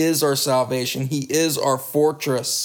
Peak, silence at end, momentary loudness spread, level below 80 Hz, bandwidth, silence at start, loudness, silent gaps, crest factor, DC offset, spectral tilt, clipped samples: -8 dBFS; 0 s; 5 LU; -66 dBFS; over 20 kHz; 0 s; -20 LUFS; none; 14 dB; under 0.1%; -4 dB/octave; under 0.1%